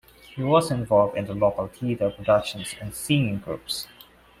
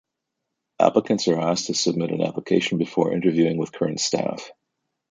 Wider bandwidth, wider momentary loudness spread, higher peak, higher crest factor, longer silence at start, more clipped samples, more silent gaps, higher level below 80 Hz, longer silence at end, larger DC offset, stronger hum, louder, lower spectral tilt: first, 16 kHz vs 9.6 kHz; first, 12 LU vs 6 LU; second, -6 dBFS vs -2 dBFS; about the same, 20 dB vs 20 dB; second, 0.3 s vs 0.8 s; neither; neither; first, -52 dBFS vs -64 dBFS; about the same, 0.55 s vs 0.6 s; neither; neither; about the same, -24 LUFS vs -22 LUFS; about the same, -5.5 dB/octave vs -4.5 dB/octave